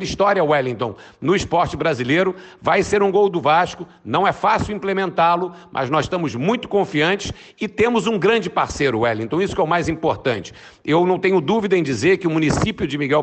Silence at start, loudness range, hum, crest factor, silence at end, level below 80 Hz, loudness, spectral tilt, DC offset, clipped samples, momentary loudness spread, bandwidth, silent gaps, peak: 0 s; 2 LU; none; 14 dB; 0 s; -44 dBFS; -19 LUFS; -5.5 dB/octave; under 0.1%; under 0.1%; 8 LU; 8.8 kHz; none; -6 dBFS